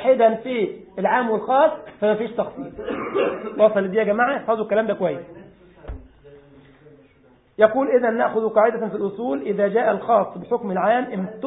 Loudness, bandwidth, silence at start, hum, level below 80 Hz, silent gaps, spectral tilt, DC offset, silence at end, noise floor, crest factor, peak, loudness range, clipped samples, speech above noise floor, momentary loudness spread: -21 LUFS; 4 kHz; 0 s; none; -52 dBFS; none; -11 dB/octave; under 0.1%; 0 s; -55 dBFS; 20 dB; -2 dBFS; 5 LU; under 0.1%; 35 dB; 11 LU